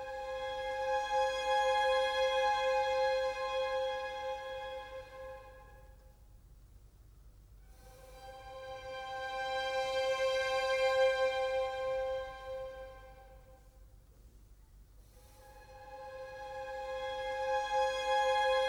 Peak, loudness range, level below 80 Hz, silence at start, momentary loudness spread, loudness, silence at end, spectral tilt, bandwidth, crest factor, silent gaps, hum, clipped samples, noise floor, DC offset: -20 dBFS; 21 LU; -58 dBFS; 0 s; 19 LU; -34 LUFS; 0 s; -1.5 dB/octave; 15 kHz; 16 dB; none; none; under 0.1%; -59 dBFS; under 0.1%